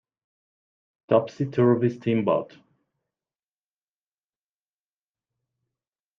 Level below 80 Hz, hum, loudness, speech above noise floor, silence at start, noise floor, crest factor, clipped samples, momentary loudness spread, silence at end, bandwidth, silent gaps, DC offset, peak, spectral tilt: -70 dBFS; none; -23 LUFS; over 67 dB; 1.1 s; under -90 dBFS; 22 dB; under 0.1%; 7 LU; 3.75 s; 6.8 kHz; none; under 0.1%; -6 dBFS; -9 dB/octave